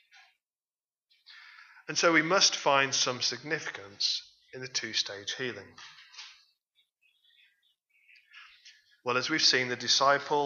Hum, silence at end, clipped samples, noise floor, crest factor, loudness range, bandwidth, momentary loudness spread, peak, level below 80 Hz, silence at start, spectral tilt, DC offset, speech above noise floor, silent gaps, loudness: none; 0 s; under 0.1%; under -90 dBFS; 22 dB; 12 LU; 7.6 kHz; 24 LU; -10 dBFS; -84 dBFS; 1.3 s; -1.5 dB/octave; under 0.1%; over 61 dB; none; -27 LUFS